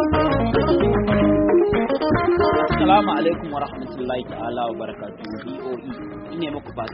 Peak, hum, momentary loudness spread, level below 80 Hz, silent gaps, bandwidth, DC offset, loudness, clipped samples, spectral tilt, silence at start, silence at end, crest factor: -4 dBFS; none; 15 LU; -36 dBFS; none; 5.6 kHz; under 0.1%; -20 LUFS; under 0.1%; -5.5 dB/octave; 0 s; 0 s; 16 dB